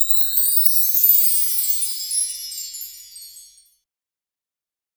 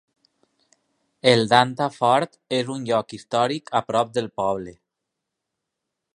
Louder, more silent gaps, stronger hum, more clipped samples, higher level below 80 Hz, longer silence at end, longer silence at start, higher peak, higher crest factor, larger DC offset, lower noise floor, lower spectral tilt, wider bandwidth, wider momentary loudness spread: first, -15 LUFS vs -22 LUFS; neither; neither; neither; second, -70 dBFS vs -64 dBFS; first, 1.55 s vs 1.4 s; second, 0 s vs 1.25 s; about the same, 0 dBFS vs 0 dBFS; about the same, 20 dB vs 24 dB; neither; first, under -90 dBFS vs -82 dBFS; second, 6 dB/octave vs -5 dB/octave; first, over 20 kHz vs 11 kHz; first, 18 LU vs 8 LU